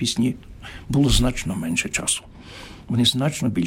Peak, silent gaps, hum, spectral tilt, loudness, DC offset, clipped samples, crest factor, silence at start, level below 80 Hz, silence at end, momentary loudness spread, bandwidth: -4 dBFS; none; none; -4 dB/octave; -22 LUFS; under 0.1%; under 0.1%; 18 dB; 0 s; -32 dBFS; 0 s; 20 LU; 16.5 kHz